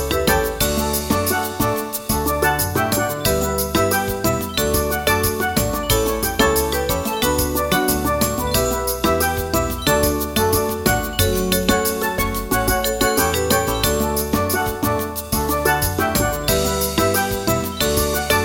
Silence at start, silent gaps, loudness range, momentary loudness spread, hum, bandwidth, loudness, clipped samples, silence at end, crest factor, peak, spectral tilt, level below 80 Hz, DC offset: 0 s; none; 1 LU; 3 LU; none; 17 kHz; -19 LUFS; under 0.1%; 0 s; 18 dB; -2 dBFS; -3.5 dB/octave; -30 dBFS; under 0.1%